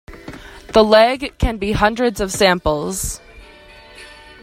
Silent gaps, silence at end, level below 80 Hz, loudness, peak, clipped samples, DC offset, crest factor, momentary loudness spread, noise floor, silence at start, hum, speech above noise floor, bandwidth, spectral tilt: none; 0.3 s; -32 dBFS; -16 LUFS; 0 dBFS; under 0.1%; under 0.1%; 18 dB; 24 LU; -42 dBFS; 0.1 s; none; 27 dB; 16 kHz; -4 dB/octave